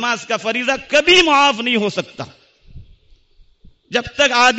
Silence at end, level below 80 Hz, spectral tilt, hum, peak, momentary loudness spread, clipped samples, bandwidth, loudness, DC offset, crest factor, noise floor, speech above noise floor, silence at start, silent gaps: 0 s; -48 dBFS; -2.5 dB/octave; none; -2 dBFS; 16 LU; under 0.1%; 8.2 kHz; -15 LUFS; under 0.1%; 16 dB; -51 dBFS; 35 dB; 0 s; none